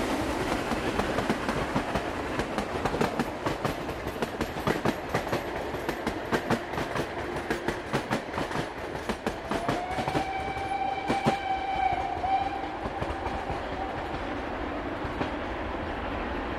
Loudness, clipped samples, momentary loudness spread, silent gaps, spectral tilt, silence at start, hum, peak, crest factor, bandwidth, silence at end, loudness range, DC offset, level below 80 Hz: -31 LUFS; under 0.1%; 5 LU; none; -5.5 dB/octave; 0 s; none; -10 dBFS; 20 dB; 16 kHz; 0 s; 3 LU; under 0.1%; -44 dBFS